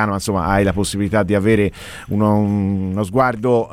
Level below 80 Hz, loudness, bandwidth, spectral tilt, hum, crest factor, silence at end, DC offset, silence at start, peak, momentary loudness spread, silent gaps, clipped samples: -38 dBFS; -17 LUFS; 15.5 kHz; -6.5 dB/octave; none; 16 dB; 0 s; 0.1%; 0 s; -2 dBFS; 5 LU; none; under 0.1%